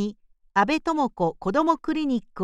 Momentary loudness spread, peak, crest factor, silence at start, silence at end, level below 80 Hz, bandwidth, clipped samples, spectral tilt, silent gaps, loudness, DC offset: 4 LU; -8 dBFS; 18 dB; 0 s; 0 s; -52 dBFS; 11 kHz; under 0.1%; -6 dB/octave; none; -24 LUFS; under 0.1%